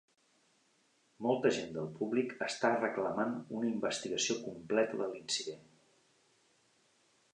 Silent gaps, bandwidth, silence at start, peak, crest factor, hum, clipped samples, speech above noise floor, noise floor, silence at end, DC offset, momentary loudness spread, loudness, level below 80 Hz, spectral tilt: none; 10.5 kHz; 1.2 s; -14 dBFS; 22 dB; none; under 0.1%; 38 dB; -73 dBFS; 1.75 s; under 0.1%; 7 LU; -35 LUFS; -78 dBFS; -3.5 dB/octave